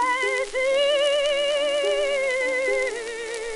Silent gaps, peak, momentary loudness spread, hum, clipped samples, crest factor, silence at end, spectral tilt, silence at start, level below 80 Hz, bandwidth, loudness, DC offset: none; -10 dBFS; 7 LU; none; under 0.1%; 14 dB; 0 s; 0 dB/octave; 0 s; -54 dBFS; 11.5 kHz; -23 LUFS; under 0.1%